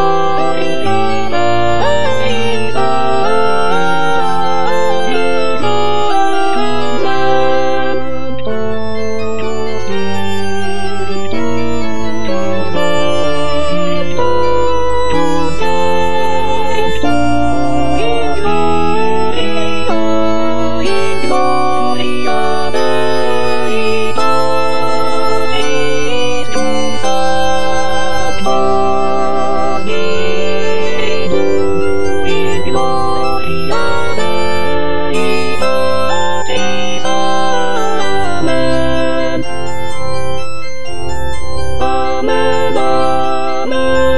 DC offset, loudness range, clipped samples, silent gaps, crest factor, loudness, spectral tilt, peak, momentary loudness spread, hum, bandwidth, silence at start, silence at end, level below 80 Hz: 40%; 4 LU; under 0.1%; none; 14 dB; -15 LUFS; -5 dB/octave; 0 dBFS; 6 LU; none; 11 kHz; 0 s; 0 s; -34 dBFS